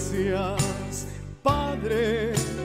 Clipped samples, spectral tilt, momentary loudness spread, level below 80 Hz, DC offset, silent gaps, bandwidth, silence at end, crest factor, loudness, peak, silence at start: under 0.1%; -5 dB/octave; 8 LU; -40 dBFS; under 0.1%; none; 16 kHz; 0 s; 18 dB; -26 LUFS; -8 dBFS; 0 s